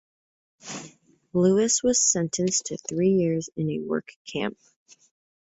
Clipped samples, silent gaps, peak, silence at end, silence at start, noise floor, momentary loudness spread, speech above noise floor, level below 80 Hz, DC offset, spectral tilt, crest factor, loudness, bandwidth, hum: under 0.1%; 4.16-4.25 s; -8 dBFS; 0.9 s; 0.65 s; -52 dBFS; 18 LU; 28 dB; -64 dBFS; under 0.1%; -4 dB/octave; 18 dB; -24 LUFS; 8.2 kHz; none